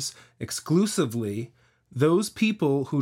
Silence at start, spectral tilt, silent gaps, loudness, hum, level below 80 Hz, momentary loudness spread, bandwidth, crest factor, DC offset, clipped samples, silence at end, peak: 0 s; -5.5 dB/octave; none; -25 LUFS; none; -66 dBFS; 15 LU; 16.5 kHz; 16 dB; under 0.1%; under 0.1%; 0 s; -8 dBFS